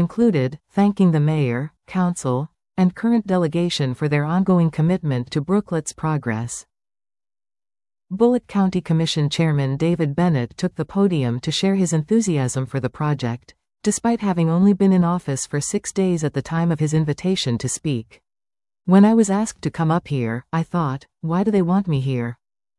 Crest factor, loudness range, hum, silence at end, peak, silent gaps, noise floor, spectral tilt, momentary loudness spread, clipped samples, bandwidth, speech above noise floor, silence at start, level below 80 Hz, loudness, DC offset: 16 dB; 3 LU; none; 0.45 s; -4 dBFS; none; under -90 dBFS; -6.5 dB/octave; 9 LU; under 0.1%; 12 kHz; over 71 dB; 0 s; -54 dBFS; -20 LUFS; under 0.1%